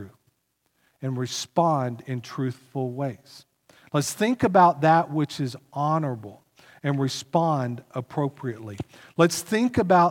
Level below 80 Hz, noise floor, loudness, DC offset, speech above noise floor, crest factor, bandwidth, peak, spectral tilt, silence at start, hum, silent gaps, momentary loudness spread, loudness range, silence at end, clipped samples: -62 dBFS; -73 dBFS; -25 LUFS; under 0.1%; 49 dB; 20 dB; 17.5 kHz; -4 dBFS; -5.5 dB/octave; 0 s; none; none; 15 LU; 6 LU; 0 s; under 0.1%